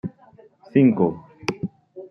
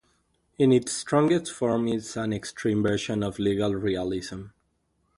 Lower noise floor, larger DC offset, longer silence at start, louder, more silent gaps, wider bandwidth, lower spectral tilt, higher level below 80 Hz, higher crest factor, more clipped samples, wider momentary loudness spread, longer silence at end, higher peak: second, -52 dBFS vs -72 dBFS; neither; second, 0.05 s vs 0.6 s; first, -21 LUFS vs -26 LUFS; neither; second, 6.8 kHz vs 11.5 kHz; first, -8 dB/octave vs -5.5 dB/octave; second, -62 dBFS vs -54 dBFS; about the same, 18 dB vs 18 dB; neither; first, 18 LU vs 9 LU; second, 0.05 s vs 0.7 s; first, -4 dBFS vs -8 dBFS